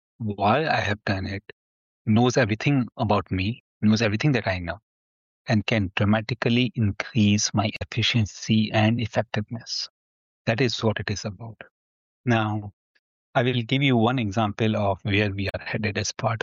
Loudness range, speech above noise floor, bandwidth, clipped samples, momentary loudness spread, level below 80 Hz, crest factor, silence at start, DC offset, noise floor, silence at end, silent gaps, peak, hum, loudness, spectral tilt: 5 LU; over 67 dB; 7.6 kHz; under 0.1%; 11 LU; -54 dBFS; 16 dB; 0.2 s; under 0.1%; under -90 dBFS; 0.05 s; 1.52-2.05 s, 3.60-3.80 s, 4.83-5.45 s, 9.90-10.45 s, 11.71-12.24 s, 12.73-13.33 s; -8 dBFS; none; -24 LUFS; -5.5 dB/octave